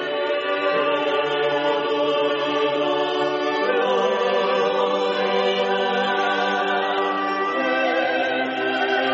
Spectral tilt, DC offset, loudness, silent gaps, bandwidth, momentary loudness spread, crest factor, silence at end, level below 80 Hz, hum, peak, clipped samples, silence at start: -1 dB/octave; under 0.1%; -21 LUFS; none; 8 kHz; 2 LU; 12 dB; 0 s; -72 dBFS; none; -8 dBFS; under 0.1%; 0 s